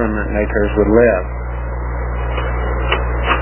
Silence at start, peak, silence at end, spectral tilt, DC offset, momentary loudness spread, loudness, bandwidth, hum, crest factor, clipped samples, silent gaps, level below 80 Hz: 0 s; 0 dBFS; 0 s; -10.5 dB/octave; under 0.1%; 12 LU; -17 LUFS; 3.2 kHz; 60 Hz at -20 dBFS; 16 dB; under 0.1%; none; -20 dBFS